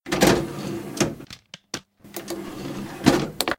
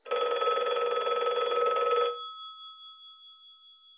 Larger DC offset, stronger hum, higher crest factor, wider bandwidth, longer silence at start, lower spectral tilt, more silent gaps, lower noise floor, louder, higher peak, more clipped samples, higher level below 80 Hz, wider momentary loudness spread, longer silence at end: neither; neither; first, 26 dB vs 14 dB; first, 17 kHz vs 4 kHz; about the same, 0.05 s vs 0.05 s; about the same, -4 dB/octave vs -3.5 dB/octave; neither; second, -44 dBFS vs -55 dBFS; first, -24 LUFS vs -28 LUFS; first, 0 dBFS vs -16 dBFS; neither; first, -46 dBFS vs -90 dBFS; about the same, 19 LU vs 20 LU; second, 0.05 s vs 0.25 s